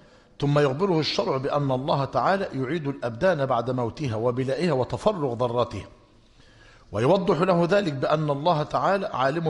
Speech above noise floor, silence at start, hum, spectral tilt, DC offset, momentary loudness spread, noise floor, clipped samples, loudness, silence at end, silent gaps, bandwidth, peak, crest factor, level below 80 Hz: 31 dB; 0.4 s; none; -7 dB/octave; under 0.1%; 7 LU; -54 dBFS; under 0.1%; -24 LUFS; 0 s; none; 11 kHz; -8 dBFS; 18 dB; -54 dBFS